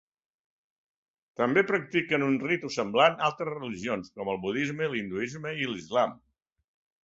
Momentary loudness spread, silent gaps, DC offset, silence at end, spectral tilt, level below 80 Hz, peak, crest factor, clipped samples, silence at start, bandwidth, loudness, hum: 10 LU; none; under 0.1%; 0.9 s; -5 dB/octave; -68 dBFS; -8 dBFS; 22 dB; under 0.1%; 1.4 s; 8 kHz; -28 LUFS; none